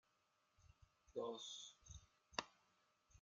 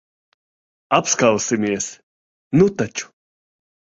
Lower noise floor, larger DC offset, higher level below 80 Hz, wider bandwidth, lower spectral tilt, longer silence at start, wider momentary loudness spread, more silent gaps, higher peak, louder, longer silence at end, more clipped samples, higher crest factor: second, -83 dBFS vs under -90 dBFS; neither; second, -76 dBFS vs -54 dBFS; first, 9.4 kHz vs 8 kHz; second, -2.5 dB/octave vs -4.5 dB/octave; second, 0.6 s vs 0.9 s; about the same, 14 LU vs 12 LU; second, none vs 2.03-2.51 s; second, -24 dBFS vs -2 dBFS; second, -52 LUFS vs -19 LUFS; second, 0 s vs 0.95 s; neither; first, 34 dB vs 20 dB